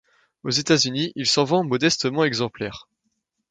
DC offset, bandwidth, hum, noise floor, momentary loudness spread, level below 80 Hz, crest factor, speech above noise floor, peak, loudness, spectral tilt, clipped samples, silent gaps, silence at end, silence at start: under 0.1%; 9.6 kHz; none; -75 dBFS; 13 LU; -60 dBFS; 20 dB; 53 dB; -4 dBFS; -21 LUFS; -3.5 dB/octave; under 0.1%; none; 0.7 s; 0.45 s